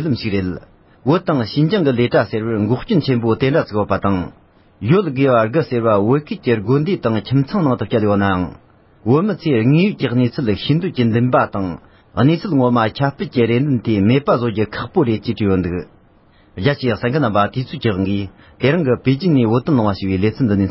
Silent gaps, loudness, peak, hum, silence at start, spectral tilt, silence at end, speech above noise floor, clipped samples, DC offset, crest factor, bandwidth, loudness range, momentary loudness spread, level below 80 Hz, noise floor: none; -17 LUFS; -2 dBFS; none; 0 s; -12 dB/octave; 0 s; 34 dB; under 0.1%; under 0.1%; 16 dB; 5.8 kHz; 2 LU; 7 LU; -42 dBFS; -50 dBFS